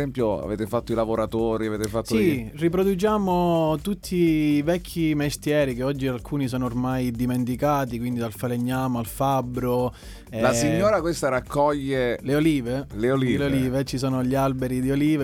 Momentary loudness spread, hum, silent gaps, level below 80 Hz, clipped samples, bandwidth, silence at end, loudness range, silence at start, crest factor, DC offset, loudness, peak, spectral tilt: 6 LU; none; none; -42 dBFS; under 0.1%; 18.5 kHz; 0 s; 3 LU; 0 s; 16 dB; under 0.1%; -24 LUFS; -8 dBFS; -6.5 dB/octave